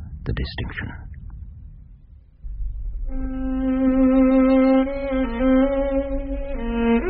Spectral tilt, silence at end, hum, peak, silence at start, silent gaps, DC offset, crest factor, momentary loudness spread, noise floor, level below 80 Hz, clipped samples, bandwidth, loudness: -6.5 dB/octave; 0 s; none; -8 dBFS; 0 s; none; under 0.1%; 14 dB; 22 LU; -47 dBFS; -30 dBFS; under 0.1%; 4.9 kHz; -21 LUFS